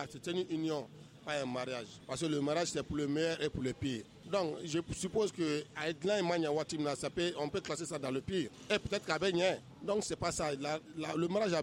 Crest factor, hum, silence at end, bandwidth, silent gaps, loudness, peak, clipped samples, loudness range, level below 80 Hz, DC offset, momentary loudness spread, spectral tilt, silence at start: 18 dB; none; 0 s; 16 kHz; none; -36 LUFS; -18 dBFS; under 0.1%; 1 LU; -62 dBFS; under 0.1%; 6 LU; -4.5 dB/octave; 0 s